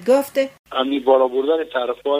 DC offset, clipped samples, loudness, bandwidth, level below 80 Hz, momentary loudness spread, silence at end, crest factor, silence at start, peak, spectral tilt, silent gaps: under 0.1%; under 0.1%; -19 LUFS; 16 kHz; -62 dBFS; 7 LU; 0 s; 16 dB; 0 s; -4 dBFS; -3.5 dB/octave; 0.59-0.64 s